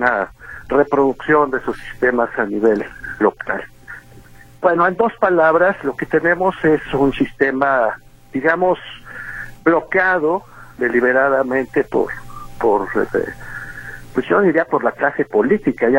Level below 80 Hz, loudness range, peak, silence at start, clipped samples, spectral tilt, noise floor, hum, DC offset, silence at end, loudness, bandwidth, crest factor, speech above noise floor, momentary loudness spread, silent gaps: -44 dBFS; 3 LU; 0 dBFS; 0 s; under 0.1%; -7 dB/octave; -42 dBFS; none; under 0.1%; 0 s; -17 LUFS; 16.5 kHz; 16 dB; 25 dB; 15 LU; none